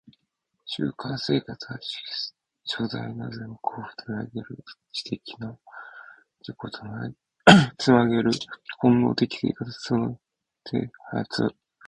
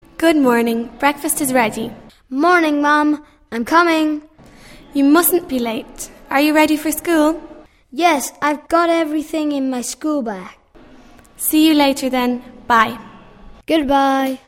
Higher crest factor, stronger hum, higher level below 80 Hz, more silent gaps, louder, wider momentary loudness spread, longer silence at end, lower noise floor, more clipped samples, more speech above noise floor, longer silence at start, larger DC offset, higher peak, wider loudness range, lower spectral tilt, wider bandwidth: first, 26 dB vs 18 dB; neither; second, -58 dBFS vs -48 dBFS; neither; second, -25 LUFS vs -16 LUFS; first, 20 LU vs 14 LU; first, 0.35 s vs 0.1 s; first, -78 dBFS vs -44 dBFS; neither; first, 53 dB vs 28 dB; first, 0.65 s vs 0.2 s; neither; about the same, 0 dBFS vs 0 dBFS; first, 15 LU vs 3 LU; first, -5.5 dB/octave vs -3 dB/octave; second, 10.5 kHz vs 16.5 kHz